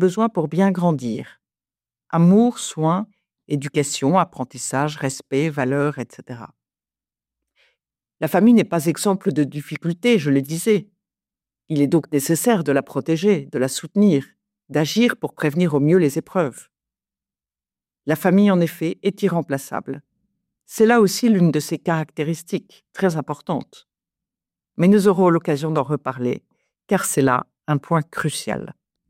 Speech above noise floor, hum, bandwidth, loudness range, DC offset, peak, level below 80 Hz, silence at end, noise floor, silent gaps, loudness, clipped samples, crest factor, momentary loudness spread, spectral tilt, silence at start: over 71 dB; none; 16 kHz; 3 LU; under 0.1%; -4 dBFS; -64 dBFS; 0.4 s; under -90 dBFS; none; -20 LUFS; under 0.1%; 16 dB; 12 LU; -6 dB/octave; 0 s